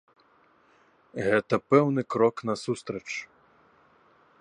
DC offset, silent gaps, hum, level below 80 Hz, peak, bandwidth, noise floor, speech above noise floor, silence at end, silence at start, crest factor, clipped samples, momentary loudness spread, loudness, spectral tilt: under 0.1%; none; none; -68 dBFS; -6 dBFS; 10.5 kHz; -62 dBFS; 36 dB; 1.15 s; 1.15 s; 22 dB; under 0.1%; 13 LU; -26 LUFS; -6.5 dB/octave